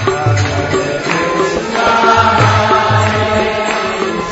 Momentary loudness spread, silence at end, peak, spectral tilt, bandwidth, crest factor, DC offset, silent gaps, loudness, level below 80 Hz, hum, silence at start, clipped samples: 6 LU; 0 s; 0 dBFS; -5 dB/octave; 8 kHz; 12 dB; under 0.1%; none; -12 LUFS; -38 dBFS; none; 0 s; under 0.1%